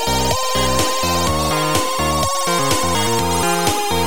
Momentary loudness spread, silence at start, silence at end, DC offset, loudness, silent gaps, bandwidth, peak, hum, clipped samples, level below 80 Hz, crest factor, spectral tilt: 1 LU; 0 s; 0 s; 4%; -17 LUFS; none; 17 kHz; -2 dBFS; none; under 0.1%; -32 dBFS; 14 dB; -3 dB/octave